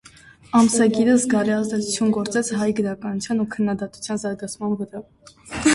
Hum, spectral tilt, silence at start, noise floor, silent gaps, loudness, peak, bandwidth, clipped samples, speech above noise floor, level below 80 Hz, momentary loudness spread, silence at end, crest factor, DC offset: none; -4.5 dB/octave; 0.55 s; -48 dBFS; none; -21 LUFS; -4 dBFS; 11.5 kHz; under 0.1%; 27 dB; -54 dBFS; 11 LU; 0 s; 16 dB; under 0.1%